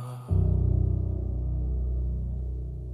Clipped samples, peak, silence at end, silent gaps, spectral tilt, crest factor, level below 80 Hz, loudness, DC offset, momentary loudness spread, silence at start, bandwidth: under 0.1%; -12 dBFS; 0 s; none; -11 dB/octave; 14 dB; -30 dBFS; -29 LUFS; under 0.1%; 9 LU; 0 s; 1.5 kHz